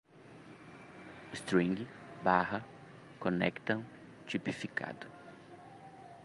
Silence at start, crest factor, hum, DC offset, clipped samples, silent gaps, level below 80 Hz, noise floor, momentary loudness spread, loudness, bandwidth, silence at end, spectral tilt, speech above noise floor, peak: 0.15 s; 24 dB; none; under 0.1%; under 0.1%; none; -70 dBFS; -55 dBFS; 22 LU; -35 LUFS; 11.5 kHz; 0 s; -6 dB/octave; 21 dB; -14 dBFS